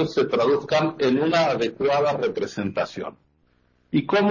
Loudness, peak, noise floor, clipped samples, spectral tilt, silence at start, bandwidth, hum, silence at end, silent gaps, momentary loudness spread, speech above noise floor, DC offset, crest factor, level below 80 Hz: -22 LUFS; -10 dBFS; -63 dBFS; under 0.1%; -6 dB/octave; 0 s; 7.4 kHz; none; 0 s; none; 8 LU; 42 dB; under 0.1%; 14 dB; -60 dBFS